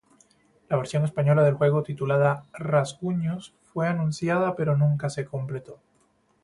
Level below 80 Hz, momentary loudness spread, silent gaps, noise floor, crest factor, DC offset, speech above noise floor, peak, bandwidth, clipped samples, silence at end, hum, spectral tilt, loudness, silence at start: -62 dBFS; 11 LU; none; -66 dBFS; 18 dB; under 0.1%; 41 dB; -8 dBFS; 11.5 kHz; under 0.1%; 0.7 s; none; -7.5 dB/octave; -25 LUFS; 0.7 s